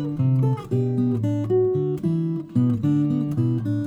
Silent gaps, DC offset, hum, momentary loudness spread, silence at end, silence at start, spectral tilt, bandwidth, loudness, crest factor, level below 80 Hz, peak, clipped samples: none; under 0.1%; none; 3 LU; 0 s; 0 s; -10.5 dB/octave; 7.6 kHz; -22 LUFS; 12 dB; -56 dBFS; -10 dBFS; under 0.1%